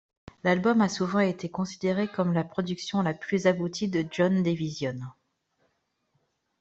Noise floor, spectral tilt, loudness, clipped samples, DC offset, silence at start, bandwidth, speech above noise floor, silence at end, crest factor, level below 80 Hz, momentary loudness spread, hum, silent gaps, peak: -75 dBFS; -6 dB/octave; -27 LUFS; under 0.1%; under 0.1%; 0.45 s; 8 kHz; 48 dB; 1.5 s; 18 dB; -64 dBFS; 8 LU; none; none; -10 dBFS